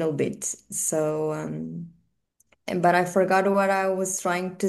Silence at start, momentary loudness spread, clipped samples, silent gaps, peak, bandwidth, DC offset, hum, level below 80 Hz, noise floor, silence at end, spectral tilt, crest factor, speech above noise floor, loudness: 0 s; 14 LU; under 0.1%; none; -8 dBFS; 12.5 kHz; under 0.1%; none; -68 dBFS; -69 dBFS; 0 s; -4.5 dB/octave; 18 dB; 45 dB; -24 LUFS